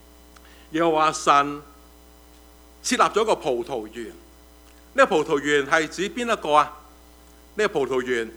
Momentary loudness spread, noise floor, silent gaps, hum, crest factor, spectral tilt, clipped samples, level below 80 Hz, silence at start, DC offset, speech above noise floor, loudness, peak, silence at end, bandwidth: 12 LU; -50 dBFS; none; none; 22 dB; -3.5 dB/octave; under 0.1%; -52 dBFS; 0.7 s; under 0.1%; 28 dB; -22 LUFS; -2 dBFS; 0 s; over 20 kHz